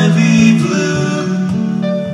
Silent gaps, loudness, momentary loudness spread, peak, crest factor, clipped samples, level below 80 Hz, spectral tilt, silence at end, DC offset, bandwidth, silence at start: none; -13 LUFS; 7 LU; 0 dBFS; 12 dB; under 0.1%; -50 dBFS; -6 dB/octave; 0 s; under 0.1%; 11.5 kHz; 0 s